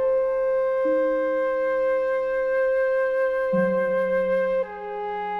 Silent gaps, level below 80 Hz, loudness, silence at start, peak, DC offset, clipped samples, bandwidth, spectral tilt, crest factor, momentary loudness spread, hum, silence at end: none; -56 dBFS; -23 LUFS; 0 s; -12 dBFS; under 0.1%; under 0.1%; 5 kHz; -7.5 dB/octave; 12 dB; 3 LU; none; 0 s